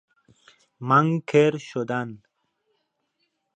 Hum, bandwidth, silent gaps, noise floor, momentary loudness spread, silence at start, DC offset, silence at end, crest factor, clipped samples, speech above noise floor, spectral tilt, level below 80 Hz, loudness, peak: none; 8.6 kHz; none; -75 dBFS; 14 LU; 0.8 s; under 0.1%; 1.4 s; 20 dB; under 0.1%; 53 dB; -7 dB/octave; -74 dBFS; -22 LUFS; -6 dBFS